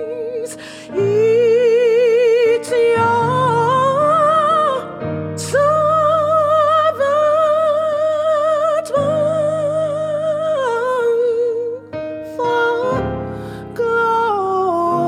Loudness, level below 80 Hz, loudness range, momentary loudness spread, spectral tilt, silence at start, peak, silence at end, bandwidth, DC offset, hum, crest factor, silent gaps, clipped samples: -16 LUFS; -50 dBFS; 5 LU; 12 LU; -5.5 dB/octave; 0 s; -6 dBFS; 0 s; 13.5 kHz; under 0.1%; none; 10 dB; none; under 0.1%